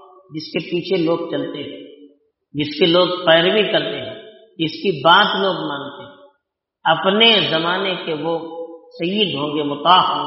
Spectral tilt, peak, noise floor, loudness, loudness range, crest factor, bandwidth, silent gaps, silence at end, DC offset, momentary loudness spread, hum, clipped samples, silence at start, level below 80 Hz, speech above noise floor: -1.5 dB/octave; 0 dBFS; -73 dBFS; -17 LUFS; 3 LU; 18 dB; 6 kHz; none; 0 s; under 0.1%; 20 LU; none; under 0.1%; 0.3 s; -64 dBFS; 56 dB